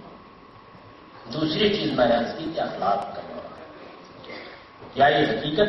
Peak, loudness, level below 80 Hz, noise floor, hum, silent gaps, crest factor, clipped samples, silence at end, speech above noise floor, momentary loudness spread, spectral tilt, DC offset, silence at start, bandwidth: -6 dBFS; -23 LUFS; -54 dBFS; -48 dBFS; none; none; 20 dB; under 0.1%; 0 s; 25 dB; 23 LU; -6.5 dB/octave; under 0.1%; 0 s; 6 kHz